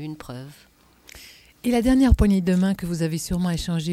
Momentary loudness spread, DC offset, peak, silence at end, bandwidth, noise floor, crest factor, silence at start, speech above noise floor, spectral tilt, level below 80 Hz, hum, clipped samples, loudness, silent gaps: 19 LU; under 0.1%; -2 dBFS; 0 s; 16 kHz; -48 dBFS; 20 dB; 0 s; 27 dB; -6.5 dB/octave; -30 dBFS; none; under 0.1%; -21 LUFS; none